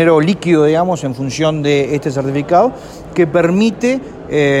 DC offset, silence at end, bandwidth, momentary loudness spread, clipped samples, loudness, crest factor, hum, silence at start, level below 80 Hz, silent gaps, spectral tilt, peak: under 0.1%; 0 s; 13 kHz; 8 LU; under 0.1%; -14 LUFS; 12 dB; none; 0 s; -46 dBFS; none; -6.5 dB/octave; 0 dBFS